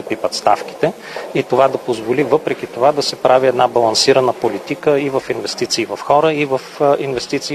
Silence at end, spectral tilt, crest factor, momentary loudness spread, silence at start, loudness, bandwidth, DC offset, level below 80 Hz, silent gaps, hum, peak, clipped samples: 0 s; -4 dB/octave; 16 dB; 8 LU; 0 s; -16 LUFS; 13.5 kHz; under 0.1%; -56 dBFS; none; none; 0 dBFS; under 0.1%